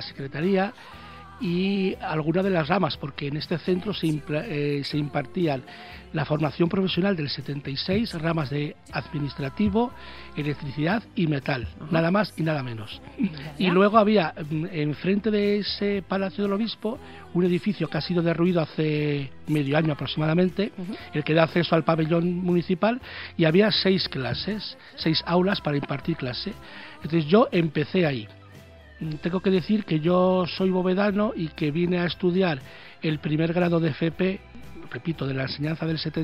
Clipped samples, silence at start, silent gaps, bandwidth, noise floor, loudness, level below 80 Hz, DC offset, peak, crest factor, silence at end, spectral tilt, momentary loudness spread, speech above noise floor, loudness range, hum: under 0.1%; 0 s; none; 11.5 kHz; -47 dBFS; -25 LUFS; -52 dBFS; under 0.1%; -4 dBFS; 22 dB; 0 s; -8 dB/octave; 11 LU; 22 dB; 4 LU; none